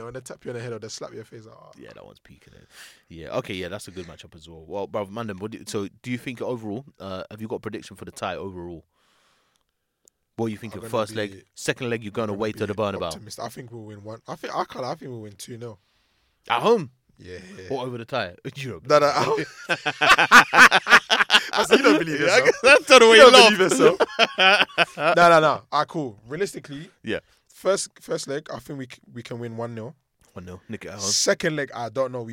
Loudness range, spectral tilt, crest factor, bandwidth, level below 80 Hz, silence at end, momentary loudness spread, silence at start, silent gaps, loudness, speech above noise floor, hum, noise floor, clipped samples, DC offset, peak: 21 LU; -3 dB/octave; 22 dB; 17 kHz; -58 dBFS; 0 s; 25 LU; 0 s; none; -18 LUFS; 51 dB; none; -73 dBFS; under 0.1%; under 0.1%; 0 dBFS